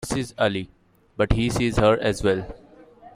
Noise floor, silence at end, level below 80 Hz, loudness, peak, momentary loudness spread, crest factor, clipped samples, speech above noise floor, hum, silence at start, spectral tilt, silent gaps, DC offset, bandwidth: -48 dBFS; 0.05 s; -36 dBFS; -23 LUFS; -4 dBFS; 18 LU; 20 dB; under 0.1%; 26 dB; none; 0 s; -5.5 dB/octave; none; under 0.1%; 15.5 kHz